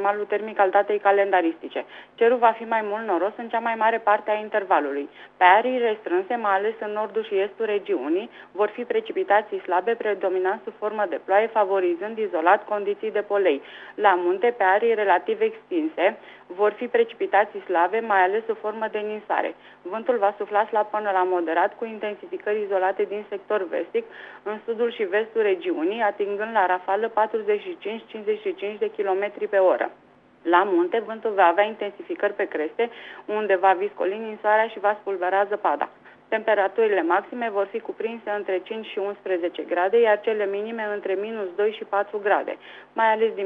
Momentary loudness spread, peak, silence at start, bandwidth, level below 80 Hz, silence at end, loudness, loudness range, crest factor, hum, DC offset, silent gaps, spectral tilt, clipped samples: 10 LU; -2 dBFS; 0 s; 4.6 kHz; -78 dBFS; 0 s; -23 LUFS; 3 LU; 22 dB; none; under 0.1%; none; -6.5 dB/octave; under 0.1%